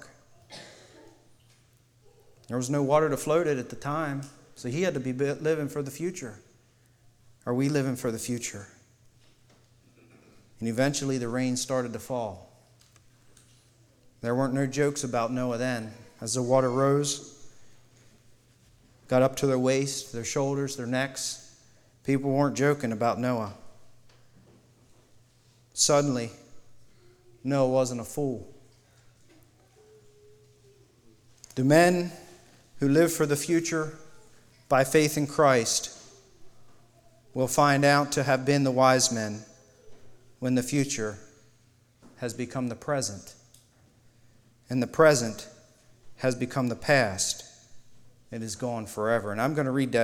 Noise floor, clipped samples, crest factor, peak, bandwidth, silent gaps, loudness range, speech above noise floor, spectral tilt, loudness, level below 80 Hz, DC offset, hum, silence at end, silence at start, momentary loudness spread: -62 dBFS; under 0.1%; 22 dB; -6 dBFS; 18 kHz; none; 8 LU; 36 dB; -4.5 dB/octave; -27 LUFS; -62 dBFS; under 0.1%; none; 0 s; 0.05 s; 17 LU